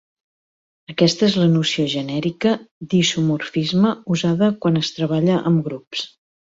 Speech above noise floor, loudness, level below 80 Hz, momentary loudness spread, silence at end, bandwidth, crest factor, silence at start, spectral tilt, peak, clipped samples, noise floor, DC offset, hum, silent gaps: over 71 dB; -19 LUFS; -58 dBFS; 10 LU; 0.5 s; 7.8 kHz; 16 dB; 0.9 s; -5.5 dB/octave; -4 dBFS; under 0.1%; under -90 dBFS; under 0.1%; none; 2.71-2.81 s, 5.87-5.91 s